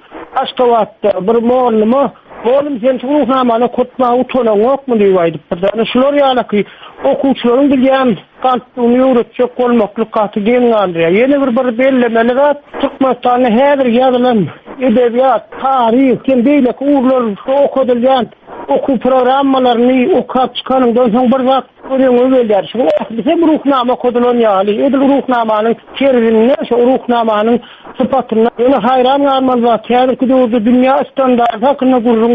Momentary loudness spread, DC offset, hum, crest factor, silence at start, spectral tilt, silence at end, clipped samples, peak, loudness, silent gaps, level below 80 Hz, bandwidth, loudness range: 5 LU; under 0.1%; none; 10 dB; 0.1 s; -8.5 dB/octave; 0 s; under 0.1%; 0 dBFS; -11 LUFS; none; -48 dBFS; 4.9 kHz; 1 LU